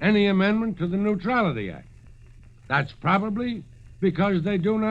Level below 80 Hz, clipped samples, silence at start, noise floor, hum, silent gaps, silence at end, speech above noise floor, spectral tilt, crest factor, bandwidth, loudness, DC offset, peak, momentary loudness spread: -50 dBFS; under 0.1%; 0 s; -48 dBFS; none; none; 0 s; 25 dB; -8.5 dB/octave; 16 dB; 7 kHz; -24 LUFS; under 0.1%; -8 dBFS; 11 LU